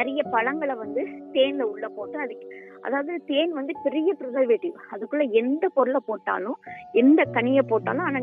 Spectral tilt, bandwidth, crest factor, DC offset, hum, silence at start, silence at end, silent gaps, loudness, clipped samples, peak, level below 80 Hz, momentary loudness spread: -8.5 dB/octave; 3.8 kHz; 16 dB; under 0.1%; none; 0 s; 0 s; none; -24 LUFS; under 0.1%; -8 dBFS; -74 dBFS; 13 LU